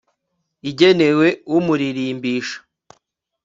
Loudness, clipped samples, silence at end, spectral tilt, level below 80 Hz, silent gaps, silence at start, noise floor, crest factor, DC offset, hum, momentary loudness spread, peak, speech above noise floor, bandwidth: -17 LUFS; under 0.1%; 0.85 s; -6 dB/octave; -62 dBFS; none; 0.65 s; -74 dBFS; 18 dB; under 0.1%; none; 16 LU; 0 dBFS; 57 dB; 7.6 kHz